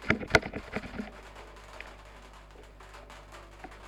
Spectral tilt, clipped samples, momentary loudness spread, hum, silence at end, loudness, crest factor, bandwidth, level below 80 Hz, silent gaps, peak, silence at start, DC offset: -4.5 dB/octave; under 0.1%; 25 LU; 50 Hz at -55 dBFS; 0 s; -31 LUFS; 30 dB; 18 kHz; -50 dBFS; none; -6 dBFS; 0 s; under 0.1%